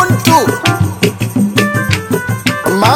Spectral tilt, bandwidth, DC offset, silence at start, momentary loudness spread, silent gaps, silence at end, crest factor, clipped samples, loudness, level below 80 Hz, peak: -5 dB/octave; 17.5 kHz; under 0.1%; 0 s; 5 LU; none; 0 s; 12 dB; under 0.1%; -12 LUFS; -40 dBFS; 0 dBFS